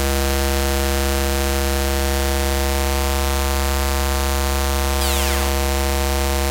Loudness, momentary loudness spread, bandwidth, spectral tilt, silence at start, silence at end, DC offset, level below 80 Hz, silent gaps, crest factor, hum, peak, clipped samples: -20 LUFS; 1 LU; 16.5 kHz; -4 dB/octave; 0 s; 0 s; under 0.1%; -22 dBFS; none; 16 dB; none; -2 dBFS; under 0.1%